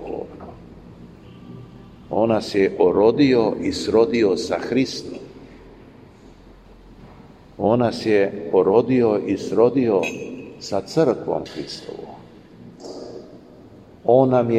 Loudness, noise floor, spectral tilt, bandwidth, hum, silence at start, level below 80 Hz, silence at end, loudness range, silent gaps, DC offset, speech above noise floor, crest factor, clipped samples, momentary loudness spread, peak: -19 LUFS; -46 dBFS; -6.5 dB/octave; 10 kHz; none; 0 s; -52 dBFS; 0 s; 8 LU; none; under 0.1%; 27 dB; 20 dB; under 0.1%; 21 LU; -2 dBFS